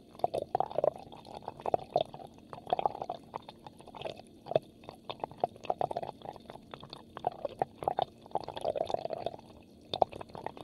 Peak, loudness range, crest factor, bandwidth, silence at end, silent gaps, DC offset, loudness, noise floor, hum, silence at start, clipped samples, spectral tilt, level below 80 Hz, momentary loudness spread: -8 dBFS; 3 LU; 30 dB; 12.5 kHz; 0 s; none; under 0.1%; -36 LUFS; -55 dBFS; none; 0 s; under 0.1%; -6 dB/octave; -66 dBFS; 17 LU